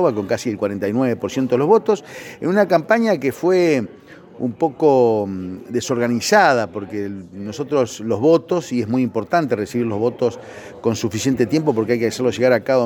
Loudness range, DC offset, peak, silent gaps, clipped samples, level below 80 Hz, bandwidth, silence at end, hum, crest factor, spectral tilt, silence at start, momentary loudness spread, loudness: 2 LU; under 0.1%; 0 dBFS; none; under 0.1%; -62 dBFS; 18 kHz; 0 s; none; 18 dB; -5.5 dB/octave; 0 s; 12 LU; -19 LUFS